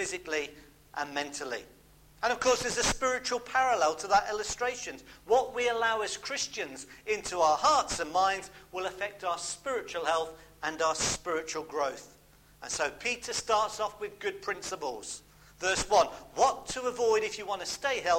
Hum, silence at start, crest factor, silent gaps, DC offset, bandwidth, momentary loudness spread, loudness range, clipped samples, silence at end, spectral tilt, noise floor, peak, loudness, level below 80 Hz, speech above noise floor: none; 0 s; 20 dB; none; under 0.1%; 16.5 kHz; 11 LU; 4 LU; under 0.1%; 0 s; -1.5 dB/octave; -58 dBFS; -12 dBFS; -30 LUFS; -56 dBFS; 27 dB